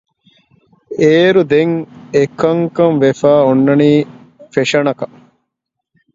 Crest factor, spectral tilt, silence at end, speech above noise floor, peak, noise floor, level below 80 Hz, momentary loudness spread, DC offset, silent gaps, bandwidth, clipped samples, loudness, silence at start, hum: 14 dB; -6.5 dB/octave; 1.1 s; 65 dB; 0 dBFS; -76 dBFS; -56 dBFS; 11 LU; under 0.1%; none; 7.8 kHz; under 0.1%; -12 LUFS; 0.9 s; none